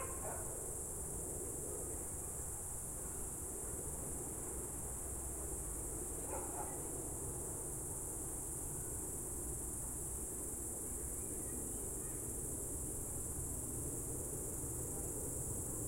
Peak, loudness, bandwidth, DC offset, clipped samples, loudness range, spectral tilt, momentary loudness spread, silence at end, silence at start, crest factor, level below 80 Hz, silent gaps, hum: -30 dBFS; -42 LUFS; 16.5 kHz; under 0.1%; under 0.1%; 1 LU; -4.5 dB/octave; 1 LU; 0 s; 0 s; 14 dB; -52 dBFS; none; none